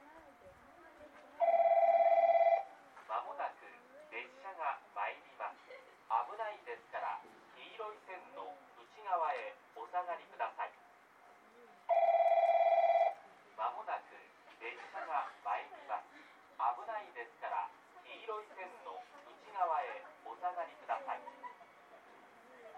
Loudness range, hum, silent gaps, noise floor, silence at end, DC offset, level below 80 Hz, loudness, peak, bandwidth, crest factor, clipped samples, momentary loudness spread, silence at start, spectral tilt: 11 LU; none; none; -63 dBFS; 0 s; under 0.1%; -88 dBFS; -36 LUFS; -20 dBFS; 6.6 kHz; 18 dB; under 0.1%; 26 LU; 0.05 s; -3 dB/octave